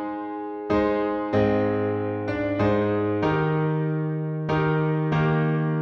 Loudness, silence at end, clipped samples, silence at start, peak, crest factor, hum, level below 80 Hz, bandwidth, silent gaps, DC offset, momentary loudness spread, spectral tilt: -24 LUFS; 0 s; under 0.1%; 0 s; -10 dBFS; 14 dB; none; -48 dBFS; 6.2 kHz; none; under 0.1%; 5 LU; -9.5 dB/octave